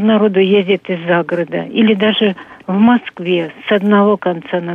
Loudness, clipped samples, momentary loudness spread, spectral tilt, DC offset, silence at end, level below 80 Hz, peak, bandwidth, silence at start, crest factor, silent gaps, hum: -14 LUFS; under 0.1%; 7 LU; -8.5 dB/octave; under 0.1%; 0 s; -60 dBFS; 0 dBFS; 3.8 kHz; 0 s; 12 dB; none; none